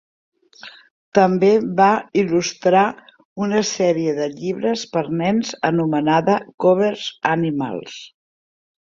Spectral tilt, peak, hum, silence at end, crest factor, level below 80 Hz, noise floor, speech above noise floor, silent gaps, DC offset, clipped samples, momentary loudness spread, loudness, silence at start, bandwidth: -5.5 dB/octave; -2 dBFS; none; 0.75 s; 18 dB; -62 dBFS; -43 dBFS; 25 dB; 0.90-1.12 s, 3.25-3.36 s, 6.54-6.58 s; under 0.1%; under 0.1%; 10 LU; -19 LUFS; 0.65 s; 7.6 kHz